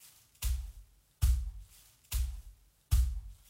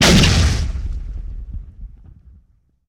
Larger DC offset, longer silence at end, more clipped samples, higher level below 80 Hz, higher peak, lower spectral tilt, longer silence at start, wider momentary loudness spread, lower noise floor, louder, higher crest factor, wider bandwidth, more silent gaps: neither; second, 0.15 s vs 1 s; neither; second, -36 dBFS vs -24 dBFS; second, -16 dBFS vs -4 dBFS; about the same, -4 dB/octave vs -4 dB/octave; first, 0.4 s vs 0 s; second, 20 LU vs 23 LU; about the same, -59 dBFS vs -56 dBFS; second, -36 LUFS vs -16 LUFS; about the same, 18 dB vs 16 dB; second, 16 kHz vs 18 kHz; neither